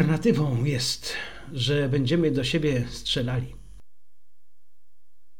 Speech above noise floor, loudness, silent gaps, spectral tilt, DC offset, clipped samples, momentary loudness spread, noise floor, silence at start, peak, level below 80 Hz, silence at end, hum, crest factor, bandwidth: 52 dB; -25 LUFS; none; -5.5 dB/octave; 0.8%; under 0.1%; 9 LU; -76 dBFS; 0 s; -8 dBFS; -48 dBFS; 0 s; none; 18 dB; 17 kHz